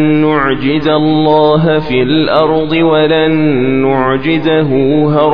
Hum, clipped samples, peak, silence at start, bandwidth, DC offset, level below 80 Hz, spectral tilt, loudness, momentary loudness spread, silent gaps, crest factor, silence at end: none; under 0.1%; 0 dBFS; 0 s; 5.4 kHz; 4%; -38 dBFS; -9.5 dB/octave; -10 LUFS; 3 LU; none; 10 dB; 0 s